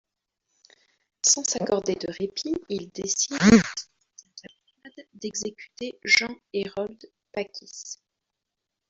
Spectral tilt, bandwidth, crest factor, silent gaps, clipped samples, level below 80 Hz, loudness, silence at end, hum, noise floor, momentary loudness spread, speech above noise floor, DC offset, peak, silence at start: -3 dB/octave; 7.8 kHz; 24 dB; none; under 0.1%; -56 dBFS; -24 LUFS; 0.95 s; none; -84 dBFS; 19 LU; 59 dB; under 0.1%; -4 dBFS; 1.25 s